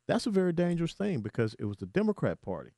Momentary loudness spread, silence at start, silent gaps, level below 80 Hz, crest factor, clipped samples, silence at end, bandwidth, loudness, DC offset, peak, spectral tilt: 5 LU; 0.1 s; none; -60 dBFS; 18 dB; under 0.1%; 0.1 s; 11.5 kHz; -31 LUFS; under 0.1%; -14 dBFS; -7 dB/octave